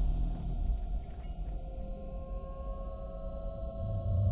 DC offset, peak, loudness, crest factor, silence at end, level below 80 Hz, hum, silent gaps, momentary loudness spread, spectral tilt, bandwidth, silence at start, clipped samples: under 0.1%; -18 dBFS; -40 LUFS; 16 dB; 0 s; -36 dBFS; none; none; 8 LU; -12 dB/octave; 4 kHz; 0 s; under 0.1%